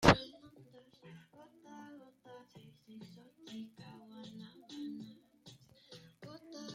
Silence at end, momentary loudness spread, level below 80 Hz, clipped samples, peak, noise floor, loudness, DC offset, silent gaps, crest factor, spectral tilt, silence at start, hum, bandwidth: 0 s; 13 LU; -56 dBFS; under 0.1%; -8 dBFS; -61 dBFS; -41 LUFS; under 0.1%; none; 32 dB; -5 dB/octave; 0 s; none; 15.5 kHz